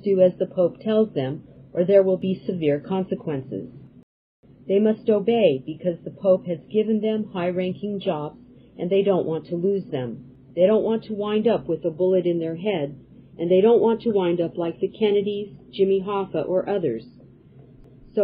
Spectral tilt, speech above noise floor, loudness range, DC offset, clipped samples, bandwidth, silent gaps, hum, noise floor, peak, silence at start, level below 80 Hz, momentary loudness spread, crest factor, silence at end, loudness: -11 dB/octave; 27 dB; 3 LU; under 0.1%; under 0.1%; 5 kHz; 4.03-4.43 s; none; -49 dBFS; -4 dBFS; 0.05 s; -60 dBFS; 12 LU; 18 dB; 0 s; -23 LUFS